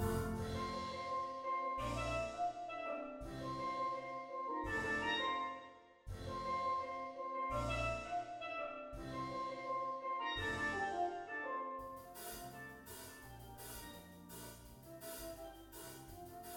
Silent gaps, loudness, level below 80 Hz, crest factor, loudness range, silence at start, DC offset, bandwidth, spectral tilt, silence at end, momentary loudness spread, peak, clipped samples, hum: none; -43 LUFS; -58 dBFS; 18 dB; 10 LU; 0 s; under 0.1%; 17.5 kHz; -4.5 dB/octave; 0 s; 14 LU; -26 dBFS; under 0.1%; none